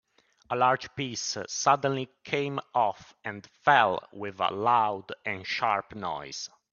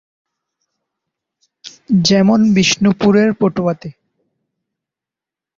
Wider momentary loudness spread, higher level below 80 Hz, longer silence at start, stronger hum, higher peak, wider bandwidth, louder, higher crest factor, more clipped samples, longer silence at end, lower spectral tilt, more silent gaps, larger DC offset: first, 14 LU vs 9 LU; second, -70 dBFS vs -52 dBFS; second, 0.5 s vs 1.65 s; neither; second, -6 dBFS vs -2 dBFS; about the same, 7.4 kHz vs 7.6 kHz; second, -28 LUFS vs -13 LUFS; first, 22 dB vs 16 dB; neither; second, 0.25 s vs 1.65 s; second, -3.5 dB/octave vs -5 dB/octave; neither; neither